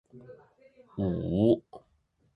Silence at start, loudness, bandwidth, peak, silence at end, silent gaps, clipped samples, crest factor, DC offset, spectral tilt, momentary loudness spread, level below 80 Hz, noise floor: 0.15 s; -28 LUFS; 4.8 kHz; -10 dBFS; 0.55 s; none; under 0.1%; 22 dB; under 0.1%; -10.5 dB/octave; 10 LU; -52 dBFS; -71 dBFS